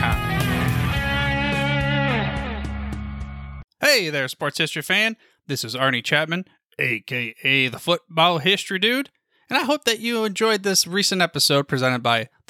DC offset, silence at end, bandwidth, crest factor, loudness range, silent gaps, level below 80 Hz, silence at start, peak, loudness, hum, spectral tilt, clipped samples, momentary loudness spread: under 0.1%; 0.25 s; 17.5 kHz; 18 dB; 3 LU; 3.64-3.68 s, 6.65-6.69 s; -38 dBFS; 0 s; -4 dBFS; -21 LUFS; none; -3.5 dB/octave; under 0.1%; 12 LU